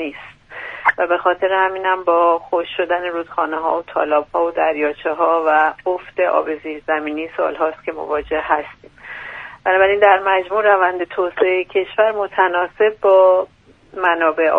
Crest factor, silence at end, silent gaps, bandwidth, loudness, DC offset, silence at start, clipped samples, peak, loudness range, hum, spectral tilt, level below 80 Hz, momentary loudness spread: 18 dB; 0 s; none; 4.6 kHz; -17 LUFS; under 0.1%; 0 s; under 0.1%; 0 dBFS; 5 LU; none; -6 dB/octave; -54 dBFS; 13 LU